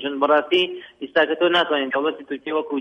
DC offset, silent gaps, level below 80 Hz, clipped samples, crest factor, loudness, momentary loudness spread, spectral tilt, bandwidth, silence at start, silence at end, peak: under 0.1%; none; -68 dBFS; under 0.1%; 16 dB; -20 LUFS; 8 LU; -5 dB/octave; 7 kHz; 0 s; 0 s; -6 dBFS